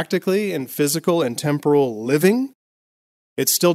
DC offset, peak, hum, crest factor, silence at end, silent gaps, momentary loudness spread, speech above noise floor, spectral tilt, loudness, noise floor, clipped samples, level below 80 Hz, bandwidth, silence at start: under 0.1%; -4 dBFS; none; 16 dB; 0 s; 2.55-3.36 s; 7 LU; over 71 dB; -4.5 dB/octave; -19 LUFS; under -90 dBFS; under 0.1%; -70 dBFS; 16 kHz; 0 s